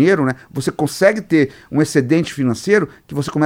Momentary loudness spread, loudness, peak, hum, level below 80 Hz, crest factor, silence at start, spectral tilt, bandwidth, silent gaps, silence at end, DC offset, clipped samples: 8 LU; -17 LUFS; 0 dBFS; none; -52 dBFS; 16 dB; 0 s; -6 dB/octave; 16.5 kHz; none; 0 s; under 0.1%; under 0.1%